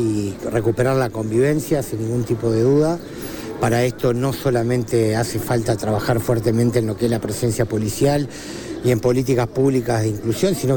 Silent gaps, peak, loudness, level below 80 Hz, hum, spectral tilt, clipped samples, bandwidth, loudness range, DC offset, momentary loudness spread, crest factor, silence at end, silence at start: none; -4 dBFS; -20 LUFS; -44 dBFS; none; -6.5 dB/octave; under 0.1%; 19 kHz; 1 LU; under 0.1%; 5 LU; 14 dB; 0 s; 0 s